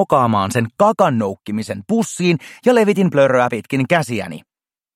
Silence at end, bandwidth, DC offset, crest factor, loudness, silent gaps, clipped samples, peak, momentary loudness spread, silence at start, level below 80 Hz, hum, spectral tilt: 0.55 s; 16 kHz; under 0.1%; 16 dB; -17 LUFS; none; under 0.1%; 0 dBFS; 11 LU; 0 s; -60 dBFS; none; -6 dB/octave